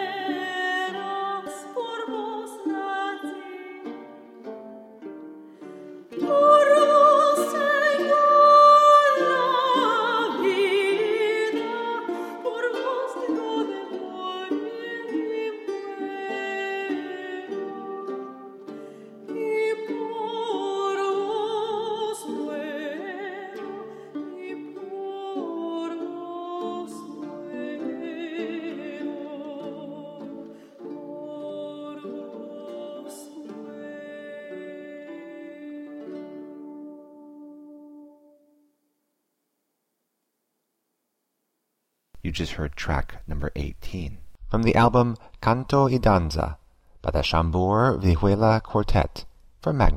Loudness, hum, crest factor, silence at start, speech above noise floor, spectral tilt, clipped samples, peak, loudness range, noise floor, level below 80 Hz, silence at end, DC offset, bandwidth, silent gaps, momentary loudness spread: -23 LUFS; none; 20 dB; 0 s; 56 dB; -6 dB/octave; under 0.1%; -4 dBFS; 21 LU; -78 dBFS; -40 dBFS; 0 s; under 0.1%; 15 kHz; none; 20 LU